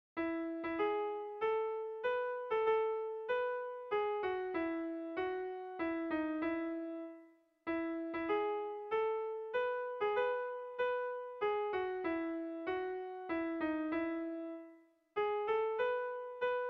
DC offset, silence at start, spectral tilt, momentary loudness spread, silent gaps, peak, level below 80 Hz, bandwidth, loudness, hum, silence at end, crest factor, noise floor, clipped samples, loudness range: under 0.1%; 0.15 s; -2.5 dB/octave; 7 LU; none; -22 dBFS; -74 dBFS; 5.4 kHz; -38 LUFS; none; 0 s; 14 dB; -62 dBFS; under 0.1%; 3 LU